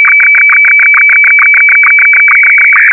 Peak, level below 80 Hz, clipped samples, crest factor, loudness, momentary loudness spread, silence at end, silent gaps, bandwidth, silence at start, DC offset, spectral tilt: 0 dBFS; -90 dBFS; under 0.1%; 4 dB; -1 LUFS; 0 LU; 0 s; none; 3 kHz; 0 s; under 0.1%; -2 dB/octave